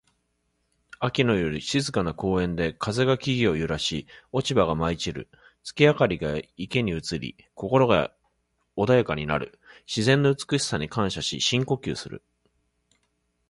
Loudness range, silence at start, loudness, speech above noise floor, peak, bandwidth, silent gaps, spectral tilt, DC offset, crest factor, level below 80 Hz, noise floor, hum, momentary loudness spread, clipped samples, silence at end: 2 LU; 1 s; -25 LUFS; 49 dB; -6 dBFS; 11.5 kHz; none; -5 dB/octave; under 0.1%; 20 dB; -48 dBFS; -73 dBFS; none; 13 LU; under 0.1%; 1.3 s